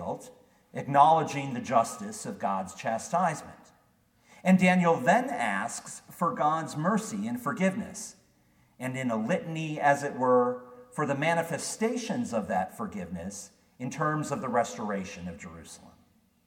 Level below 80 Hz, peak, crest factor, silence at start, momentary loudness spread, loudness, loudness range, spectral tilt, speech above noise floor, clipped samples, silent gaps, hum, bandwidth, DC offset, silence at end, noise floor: -68 dBFS; -6 dBFS; 24 dB; 0 s; 17 LU; -28 LUFS; 5 LU; -5.5 dB/octave; 38 dB; under 0.1%; none; none; 16.5 kHz; under 0.1%; 0.55 s; -66 dBFS